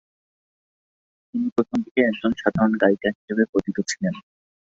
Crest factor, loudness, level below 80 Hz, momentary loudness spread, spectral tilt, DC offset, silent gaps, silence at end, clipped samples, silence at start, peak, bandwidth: 22 dB; -23 LUFS; -58 dBFS; 8 LU; -5.5 dB/octave; under 0.1%; 1.52-1.56 s, 1.91-1.95 s, 3.15-3.28 s, 3.49-3.53 s; 0.5 s; under 0.1%; 1.35 s; -2 dBFS; 8.2 kHz